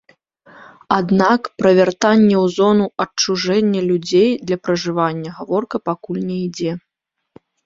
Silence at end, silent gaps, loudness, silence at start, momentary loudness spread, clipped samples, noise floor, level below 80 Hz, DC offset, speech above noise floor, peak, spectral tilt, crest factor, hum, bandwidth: 0.9 s; none; -17 LUFS; 0.9 s; 10 LU; under 0.1%; -77 dBFS; -58 dBFS; under 0.1%; 61 dB; 0 dBFS; -5.5 dB/octave; 16 dB; none; 7.6 kHz